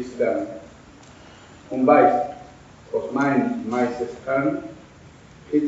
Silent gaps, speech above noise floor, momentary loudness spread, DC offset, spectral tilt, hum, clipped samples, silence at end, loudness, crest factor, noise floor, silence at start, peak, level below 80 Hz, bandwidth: none; 26 dB; 17 LU; under 0.1%; -6 dB/octave; none; under 0.1%; 0 s; -22 LUFS; 22 dB; -47 dBFS; 0 s; -2 dBFS; -58 dBFS; 8 kHz